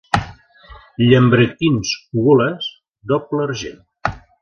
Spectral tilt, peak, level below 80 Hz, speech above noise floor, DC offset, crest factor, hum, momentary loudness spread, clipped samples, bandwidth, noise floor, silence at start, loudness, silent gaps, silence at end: -6 dB/octave; 0 dBFS; -42 dBFS; 28 dB; under 0.1%; 18 dB; none; 17 LU; under 0.1%; 7.8 kHz; -43 dBFS; 0.15 s; -17 LUFS; none; 0.25 s